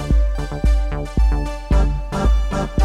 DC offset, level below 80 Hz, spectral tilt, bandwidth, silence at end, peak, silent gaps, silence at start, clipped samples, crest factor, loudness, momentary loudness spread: under 0.1%; -18 dBFS; -7 dB/octave; 9.4 kHz; 0 s; -4 dBFS; none; 0 s; under 0.1%; 12 dB; -21 LUFS; 4 LU